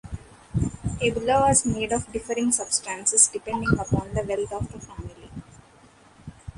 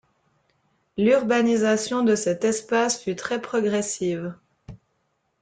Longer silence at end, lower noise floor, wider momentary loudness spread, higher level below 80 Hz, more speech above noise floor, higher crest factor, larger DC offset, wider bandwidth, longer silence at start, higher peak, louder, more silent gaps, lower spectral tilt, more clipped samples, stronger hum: second, 0.05 s vs 0.65 s; second, -53 dBFS vs -72 dBFS; first, 22 LU vs 8 LU; first, -42 dBFS vs -62 dBFS; second, 29 dB vs 50 dB; first, 22 dB vs 16 dB; neither; first, 11.5 kHz vs 9.6 kHz; second, 0.05 s vs 0.95 s; first, -4 dBFS vs -8 dBFS; about the same, -23 LUFS vs -23 LUFS; neither; about the same, -4 dB/octave vs -4 dB/octave; neither; neither